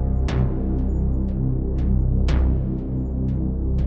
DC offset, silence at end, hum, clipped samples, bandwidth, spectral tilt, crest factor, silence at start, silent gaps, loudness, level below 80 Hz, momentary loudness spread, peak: under 0.1%; 0 s; none; under 0.1%; 6.6 kHz; -9.5 dB/octave; 12 dB; 0 s; none; -23 LUFS; -22 dBFS; 4 LU; -8 dBFS